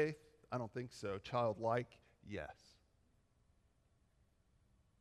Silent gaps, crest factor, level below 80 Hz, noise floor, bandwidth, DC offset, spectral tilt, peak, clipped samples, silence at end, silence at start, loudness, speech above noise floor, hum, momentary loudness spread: none; 20 dB; -74 dBFS; -76 dBFS; 12.5 kHz; under 0.1%; -6.5 dB/octave; -24 dBFS; under 0.1%; 2.5 s; 0 s; -43 LUFS; 34 dB; none; 16 LU